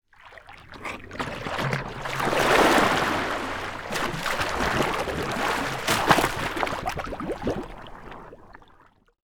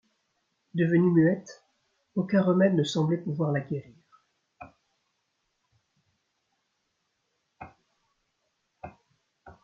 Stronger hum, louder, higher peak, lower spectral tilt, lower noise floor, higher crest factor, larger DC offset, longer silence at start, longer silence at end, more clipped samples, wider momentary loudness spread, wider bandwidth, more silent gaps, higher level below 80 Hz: neither; about the same, -25 LUFS vs -26 LUFS; first, -2 dBFS vs -10 dBFS; second, -4 dB/octave vs -7.5 dB/octave; second, -56 dBFS vs -78 dBFS; about the same, 24 dB vs 20 dB; neither; second, 0.25 s vs 0.75 s; first, 0.7 s vs 0.15 s; neither; about the same, 21 LU vs 22 LU; first, over 20 kHz vs 7.6 kHz; neither; first, -44 dBFS vs -70 dBFS